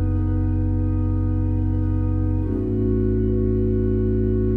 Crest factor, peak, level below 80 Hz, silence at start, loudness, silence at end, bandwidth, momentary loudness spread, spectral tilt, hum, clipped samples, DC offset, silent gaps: 10 dB; -10 dBFS; -26 dBFS; 0 s; -22 LUFS; 0 s; 2.6 kHz; 2 LU; -13 dB/octave; none; under 0.1%; under 0.1%; none